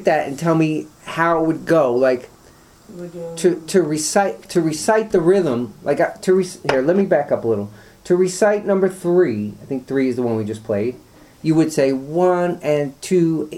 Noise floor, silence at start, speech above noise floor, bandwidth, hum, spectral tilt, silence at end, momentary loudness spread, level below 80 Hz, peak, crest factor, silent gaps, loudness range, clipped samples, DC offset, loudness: -48 dBFS; 0 s; 30 dB; 15 kHz; none; -5.5 dB/octave; 0 s; 9 LU; -54 dBFS; 0 dBFS; 18 dB; none; 2 LU; under 0.1%; under 0.1%; -18 LUFS